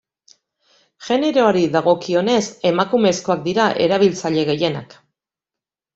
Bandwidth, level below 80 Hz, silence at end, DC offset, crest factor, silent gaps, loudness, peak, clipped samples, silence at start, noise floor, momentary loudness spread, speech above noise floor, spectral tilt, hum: 8 kHz; -60 dBFS; 1.1 s; under 0.1%; 16 dB; none; -17 LUFS; -2 dBFS; under 0.1%; 1 s; -88 dBFS; 5 LU; 71 dB; -5 dB/octave; none